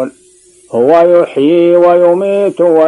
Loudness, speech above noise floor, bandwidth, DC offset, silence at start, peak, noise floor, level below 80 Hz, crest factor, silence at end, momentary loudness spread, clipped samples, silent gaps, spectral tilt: -9 LUFS; 36 dB; 11 kHz; under 0.1%; 0 s; 0 dBFS; -44 dBFS; -60 dBFS; 8 dB; 0 s; 6 LU; 0.8%; none; -7.5 dB/octave